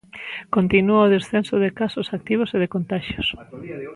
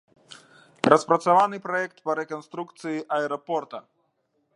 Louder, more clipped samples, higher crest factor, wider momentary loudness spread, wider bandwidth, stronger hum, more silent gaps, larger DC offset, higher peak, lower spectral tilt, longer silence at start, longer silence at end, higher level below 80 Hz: first, -21 LUFS vs -24 LUFS; neither; second, 18 dB vs 26 dB; about the same, 16 LU vs 15 LU; about the same, 11.5 kHz vs 11.5 kHz; neither; neither; neither; second, -4 dBFS vs 0 dBFS; first, -7 dB/octave vs -5 dB/octave; second, 0.15 s vs 0.3 s; second, 0 s vs 0.75 s; first, -48 dBFS vs -74 dBFS